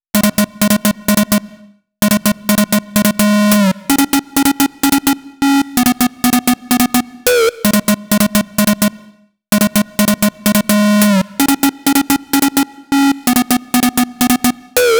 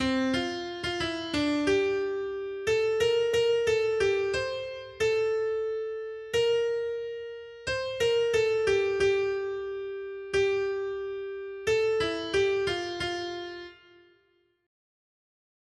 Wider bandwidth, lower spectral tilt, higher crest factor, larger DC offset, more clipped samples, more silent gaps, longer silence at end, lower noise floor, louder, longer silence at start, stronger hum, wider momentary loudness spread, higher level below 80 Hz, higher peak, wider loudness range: first, over 20 kHz vs 12.5 kHz; about the same, -4 dB/octave vs -4 dB/octave; about the same, 14 dB vs 14 dB; neither; neither; neither; second, 0 s vs 1.9 s; second, -45 dBFS vs -69 dBFS; first, -13 LUFS vs -28 LUFS; first, 0.15 s vs 0 s; neither; second, 3 LU vs 11 LU; first, -42 dBFS vs -56 dBFS; first, 0 dBFS vs -14 dBFS; about the same, 1 LU vs 3 LU